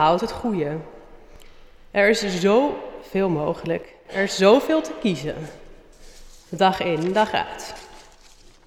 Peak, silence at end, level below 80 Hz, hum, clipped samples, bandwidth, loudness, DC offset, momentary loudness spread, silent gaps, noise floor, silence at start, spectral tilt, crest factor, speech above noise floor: -4 dBFS; 0.7 s; -48 dBFS; none; under 0.1%; 19 kHz; -22 LUFS; under 0.1%; 16 LU; none; -49 dBFS; 0 s; -5 dB/octave; 20 dB; 28 dB